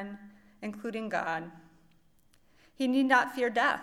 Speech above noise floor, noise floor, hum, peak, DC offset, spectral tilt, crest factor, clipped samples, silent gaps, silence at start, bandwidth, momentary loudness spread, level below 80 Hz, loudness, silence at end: 34 dB; -63 dBFS; none; -10 dBFS; under 0.1%; -4.5 dB/octave; 22 dB; under 0.1%; none; 0 s; 15 kHz; 19 LU; -70 dBFS; -29 LUFS; 0 s